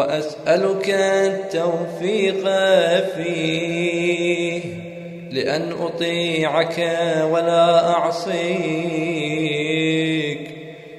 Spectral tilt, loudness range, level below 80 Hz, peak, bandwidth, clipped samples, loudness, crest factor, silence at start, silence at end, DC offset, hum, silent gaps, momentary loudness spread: -5 dB/octave; 3 LU; -64 dBFS; -4 dBFS; 13 kHz; under 0.1%; -20 LUFS; 16 dB; 0 s; 0 s; under 0.1%; none; none; 9 LU